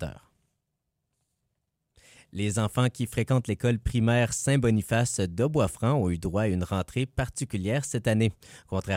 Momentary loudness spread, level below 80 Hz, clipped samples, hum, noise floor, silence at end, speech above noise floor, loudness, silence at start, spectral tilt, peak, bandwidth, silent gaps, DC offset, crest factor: 7 LU; -46 dBFS; under 0.1%; none; -81 dBFS; 0 s; 55 dB; -27 LUFS; 0 s; -6 dB/octave; -12 dBFS; 16 kHz; none; under 0.1%; 16 dB